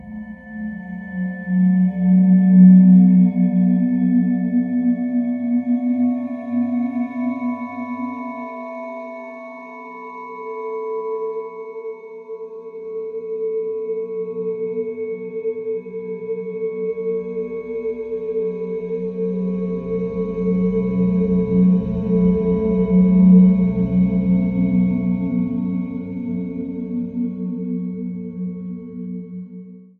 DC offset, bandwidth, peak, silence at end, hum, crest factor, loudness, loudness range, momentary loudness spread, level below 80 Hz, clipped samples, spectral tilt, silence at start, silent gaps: under 0.1%; 2.6 kHz; -2 dBFS; 0.15 s; none; 16 dB; -19 LUFS; 15 LU; 18 LU; -46 dBFS; under 0.1%; -12.5 dB/octave; 0 s; none